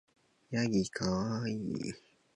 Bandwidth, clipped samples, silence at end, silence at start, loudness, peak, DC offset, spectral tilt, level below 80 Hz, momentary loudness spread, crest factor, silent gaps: 11 kHz; under 0.1%; 0.35 s; 0.5 s; -35 LUFS; -16 dBFS; under 0.1%; -5.5 dB/octave; -60 dBFS; 9 LU; 18 dB; none